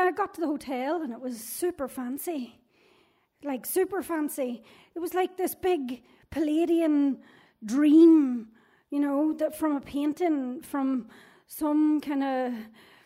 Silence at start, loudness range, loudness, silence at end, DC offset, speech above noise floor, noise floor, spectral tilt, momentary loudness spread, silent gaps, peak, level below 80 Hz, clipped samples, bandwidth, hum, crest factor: 0 s; 9 LU; -27 LUFS; 0.4 s; under 0.1%; 39 dB; -65 dBFS; -4.5 dB/octave; 14 LU; none; -10 dBFS; -66 dBFS; under 0.1%; 16 kHz; none; 18 dB